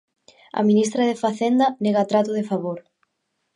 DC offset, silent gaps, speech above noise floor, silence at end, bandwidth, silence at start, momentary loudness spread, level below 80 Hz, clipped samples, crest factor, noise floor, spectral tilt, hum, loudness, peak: under 0.1%; none; 55 dB; 0.75 s; 11 kHz; 0.55 s; 10 LU; -72 dBFS; under 0.1%; 16 dB; -75 dBFS; -6 dB/octave; none; -21 LUFS; -6 dBFS